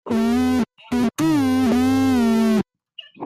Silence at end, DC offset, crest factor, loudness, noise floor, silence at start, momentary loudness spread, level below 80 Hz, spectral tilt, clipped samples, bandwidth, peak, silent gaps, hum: 0 s; under 0.1%; 10 dB; -19 LUFS; -44 dBFS; 0.05 s; 6 LU; -48 dBFS; -6 dB/octave; under 0.1%; 15.5 kHz; -10 dBFS; none; none